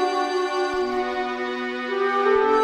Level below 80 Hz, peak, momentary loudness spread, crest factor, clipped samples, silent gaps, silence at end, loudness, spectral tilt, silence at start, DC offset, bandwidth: -54 dBFS; -8 dBFS; 7 LU; 14 dB; under 0.1%; none; 0 s; -23 LUFS; -3 dB/octave; 0 s; under 0.1%; 10.5 kHz